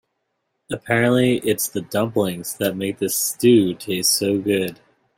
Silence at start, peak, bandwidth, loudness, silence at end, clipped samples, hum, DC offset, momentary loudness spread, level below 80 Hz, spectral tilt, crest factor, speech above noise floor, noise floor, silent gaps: 0.7 s; -4 dBFS; 16.5 kHz; -20 LUFS; 0.45 s; under 0.1%; none; under 0.1%; 9 LU; -60 dBFS; -4 dB/octave; 16 dB; 54 dB; -74 dBFS; none